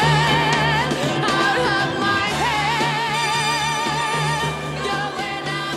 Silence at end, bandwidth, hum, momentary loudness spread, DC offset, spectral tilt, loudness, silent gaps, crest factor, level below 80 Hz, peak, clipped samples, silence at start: 0 s; 15 kHz; none; 7 LU; under 0.1%; -4 dB/octave; -19 LUFS; none; 14 dB; -44 dBFS; -6 dBFS; under 0.1%; 0 s